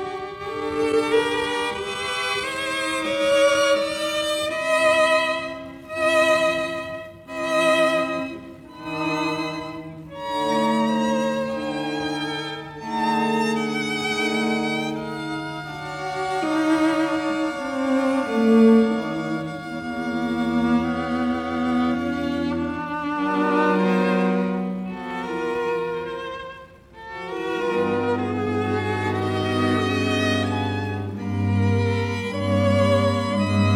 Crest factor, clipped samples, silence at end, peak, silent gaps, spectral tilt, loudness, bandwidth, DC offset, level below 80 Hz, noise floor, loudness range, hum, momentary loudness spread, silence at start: 16 dB; under 0.1%; 0 s; -6 dBFS; none; -5.5 dB/octave; -22 LUFS; 16.5 kHz; under 0.1%; -54 dBFS; -43 dBFS; 5 LU; none; 12 LU; 0 s